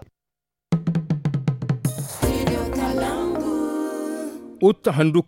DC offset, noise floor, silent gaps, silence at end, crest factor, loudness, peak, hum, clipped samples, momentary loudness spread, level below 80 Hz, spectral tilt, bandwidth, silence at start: under 0.1%; -87 dBFS; none; 0.05 s; 18 dB; -23 LUFS; -4 dBFS; none; under 0.1%; 9 LU; -40 dBFS; -6.5 dB/octave; 17 kHz; 0.7 s